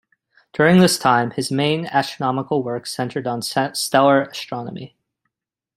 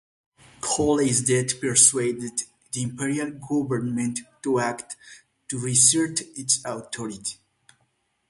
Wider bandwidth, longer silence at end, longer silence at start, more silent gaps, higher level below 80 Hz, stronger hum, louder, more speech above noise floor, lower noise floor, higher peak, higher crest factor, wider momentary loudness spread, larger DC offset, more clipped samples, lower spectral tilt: first, 16 kHz vs 11.5 kHz; about the same, 0.9 s vs 0.95 s; about the same, 0.55 s vs 0.65 s; neither; about the same, -60 dBFS vs -58 dBFS; neither; first, -19 LUFS vs -23 LUFS; first, 63 dB vs 47 dB; first, -81 dBFS vs -70 dBFS; about the same, -2 dBFS vs 0 dBFS; second, 18 dB vs 24 dB; second, 14 LU vs 17 LU; neither; neither; first, -5 dB/octave vs -3 dB/octave